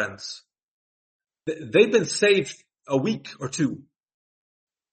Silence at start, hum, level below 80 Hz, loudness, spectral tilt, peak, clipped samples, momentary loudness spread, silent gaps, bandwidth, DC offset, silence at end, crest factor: 0 s; none; -68 dBFS; -23 LUFS; -4.5 dB/octave; -4 dBFS; under 0.1%; 17 LU; 0.63-1.20 s; 8.8 kHz; under 0.1%; 1.1 s; 22 dB